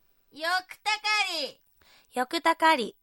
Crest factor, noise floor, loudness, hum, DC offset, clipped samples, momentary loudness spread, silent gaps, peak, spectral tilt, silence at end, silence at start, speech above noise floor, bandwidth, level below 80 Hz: 20 dB; -61 dBFS; -27 LUFS; none; under 0.1%; under 0.1%; 11 LU; none; -10 dBFS; -1.5 dB/octave; 0.1 s; 0.35 s; 33 dB; 16.5 kHz; -76 dBFS